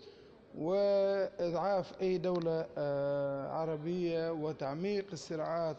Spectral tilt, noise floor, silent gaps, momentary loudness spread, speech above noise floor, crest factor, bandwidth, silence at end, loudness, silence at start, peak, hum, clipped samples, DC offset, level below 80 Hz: -7 dB/octave; -56 dBFS; none; 7 LU; 22 dB; 12 dB; 8.2 kHz; 0 s; -35 LUFS; 0 s; -22 dBFS; none; under 0.1%; under 0.1%; -68 dBFS